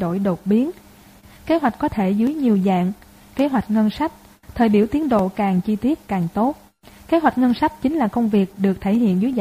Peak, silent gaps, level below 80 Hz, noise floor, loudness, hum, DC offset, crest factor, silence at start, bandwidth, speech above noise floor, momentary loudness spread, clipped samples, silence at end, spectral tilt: -4 dBFS; none; -48 dBFS; -46 dBFS; -20 LUFS; none; under 0.1%; 16 dB; 0 s; 15.5 kHz; 28 dB; 7 LU; under 0.1%; 0 s; -8 dB/octave